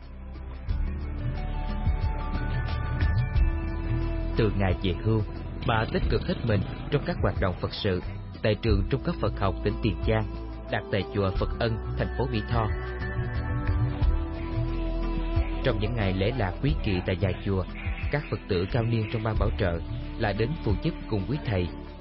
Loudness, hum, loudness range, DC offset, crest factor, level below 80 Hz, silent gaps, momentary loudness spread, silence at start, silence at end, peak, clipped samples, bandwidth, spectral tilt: -29 LUFS; none; 2 LU; under 0.1%; 16 dB; -32 dBFS; none; 6 LU; 0 s; 0 s; -12 dBFS; under 0.1%; 5.8 kHz; -11 dB/octave